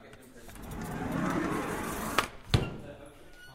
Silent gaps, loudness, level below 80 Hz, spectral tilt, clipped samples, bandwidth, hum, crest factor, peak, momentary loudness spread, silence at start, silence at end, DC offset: none; -33 LUFS; -46 dBFS; -5 dB/octave; under 0.1%; 16 kHz; none; 30 dB; -6 dBFS; 20 LU; 0 s; 0 s; under 0.1%